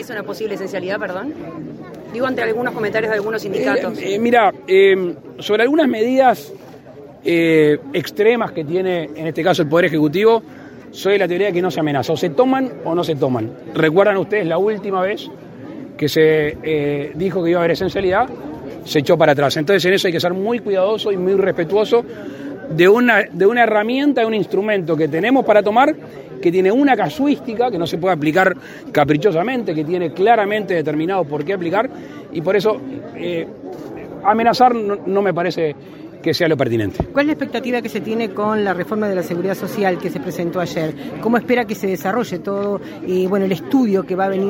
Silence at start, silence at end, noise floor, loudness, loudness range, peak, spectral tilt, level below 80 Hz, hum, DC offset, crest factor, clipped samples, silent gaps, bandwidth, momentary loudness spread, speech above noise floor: 0 s; 0 s; -38 dBFS; -17 LUFS; 5 LU; 0 dBFS; -6 dB/octave; -54 dBFS; none; under 0.1%; 16 dB; under 0.1%; none; 16.5 kHz; 12 LU; 21 dB